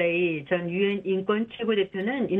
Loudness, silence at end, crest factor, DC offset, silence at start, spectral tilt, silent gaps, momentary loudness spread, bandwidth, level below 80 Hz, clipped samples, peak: -26 LUFS; 0 s; 14 dB; under 0.1%; 0 s; -9 dB/octave; none; 3 LU; 4 kHz; -66 dBFS; under 0.1%; -12 dBFS